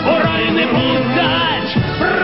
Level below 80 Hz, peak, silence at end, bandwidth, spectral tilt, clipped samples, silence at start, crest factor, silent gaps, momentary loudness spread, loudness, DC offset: -38 dBFS; -4 dBFS; 0 s; 5.8 kHz; -9.5 dB/octave; under 0.1%; 0 s; 12 dB; none; 2 LU; -15 LUFS; 0.7%